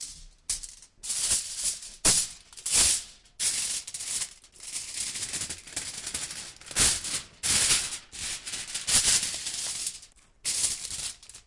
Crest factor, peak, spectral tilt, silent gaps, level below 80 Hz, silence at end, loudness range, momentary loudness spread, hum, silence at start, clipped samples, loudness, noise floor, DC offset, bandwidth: 22 dB; -8 dBFS; 0.5 dB/octave; none; -52 dBFS; 0.05 s; 6 LU; 14 LU; none; 0 s; under 0.1%; -27 LUFS; -51 dBFS; under 0.1%; 11.5 kHz